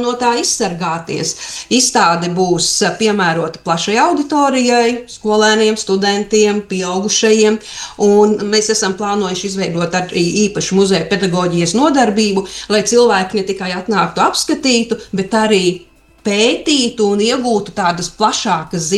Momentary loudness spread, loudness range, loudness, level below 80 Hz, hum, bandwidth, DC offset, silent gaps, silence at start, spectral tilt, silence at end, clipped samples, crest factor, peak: 8 LU; 2 LU; -14 LUFS; -48 dBFS; none; 12.5 kHz; under 0.1%; none; 0 s; -3.5 dB/octave; 0 s; under 0.1%; 14 dB; 0 dBFS